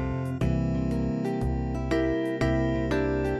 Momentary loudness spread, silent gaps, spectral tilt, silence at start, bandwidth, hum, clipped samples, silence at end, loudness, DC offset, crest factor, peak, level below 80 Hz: 3 LU; none; -8 dB/octave; 0 s; 12 kHz; none; under 0.1%; 0 s; -27 LUFS; under 0.1%; 14 dB; -12 dBFS; -36 dBFS